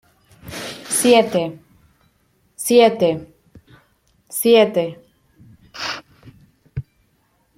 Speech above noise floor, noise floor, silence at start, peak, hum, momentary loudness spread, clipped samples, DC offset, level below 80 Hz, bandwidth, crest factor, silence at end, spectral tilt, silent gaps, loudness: 48 dB; -63 dBFS; 0.45 s; -2 dBFS; none; 20 LU; under 0.1%; under 0.1%; -54 dBFS; 16.5 kHz; 20 dB; 0.75 s; -3.5 dB/octave; none; -17 LUFS